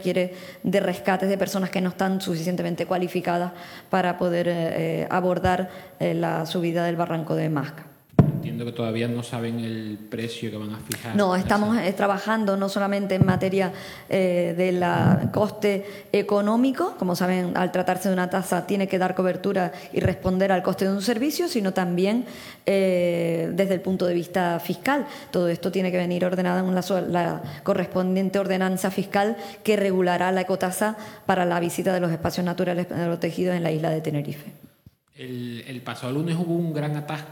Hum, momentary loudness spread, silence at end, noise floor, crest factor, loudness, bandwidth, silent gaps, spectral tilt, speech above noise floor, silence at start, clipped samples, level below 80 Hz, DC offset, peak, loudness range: none; 8 LU; 0 s; -55 dBFS; 18 dB; -24 LUFS; 19 kHz; none; -6.5 dB/octave; 31 dB; 0 s; under 0.1%; -56 dBFS; under 0.1%; -6 dBFS; 4 LU